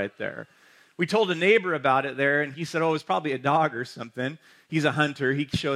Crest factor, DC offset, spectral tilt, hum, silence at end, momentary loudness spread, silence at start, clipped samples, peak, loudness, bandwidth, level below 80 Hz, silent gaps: 18 dB; under 0.1%; -5.5 dB/octave; none; 0 s; 12 LU; 0 s; under 0.1%; -8 dBFS; -25 LUFS; 13.5 kHz; -60 dBFS; none